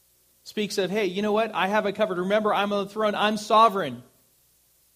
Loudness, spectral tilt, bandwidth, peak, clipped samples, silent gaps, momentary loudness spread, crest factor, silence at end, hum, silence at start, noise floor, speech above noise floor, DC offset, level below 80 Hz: -24 LUFS; -4.5 dB/octave; 15.5 kHz; -6 dBFS; under 0.1%; none; 12 LU; 18 dB; 0.95 s; none; 0.45 s; -63 dBFS; 39 dB; under 0.1%; -70 dBFS